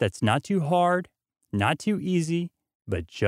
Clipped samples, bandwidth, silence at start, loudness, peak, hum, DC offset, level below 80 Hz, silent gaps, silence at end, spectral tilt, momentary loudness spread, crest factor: under 0.1%; 14.5 kHz; 0 s; -26 LUFS; -6 dBFS; none; under 0.1%; -54 dBFS; 2.75-2.80 s; 0 s; -6 dB/octave; 11 LU; 20 dB